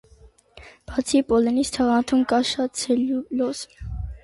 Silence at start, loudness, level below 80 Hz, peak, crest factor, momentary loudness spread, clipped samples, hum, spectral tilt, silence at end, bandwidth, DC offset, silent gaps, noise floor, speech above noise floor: 0.55 s; -22 LUFS; -42 dBFS; -8 dBFS; 14 dB; 13 LU; under 0.1%; none; -4.5 dB/octave; 0.05 s; 11.5 kHz; under 0.1%; none; -52 dBFS; 31 dB